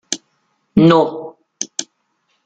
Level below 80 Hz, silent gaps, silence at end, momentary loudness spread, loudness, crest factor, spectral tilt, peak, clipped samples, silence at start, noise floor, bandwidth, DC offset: -52 dBFS; none; 0.65 s; 18 LU; -16 LUFS; 16 dB; -5 dB/octave; -2 dBFS; under 0.1%; 0.1 s; -66 dBFS; 9.4 kHz; under 0.1%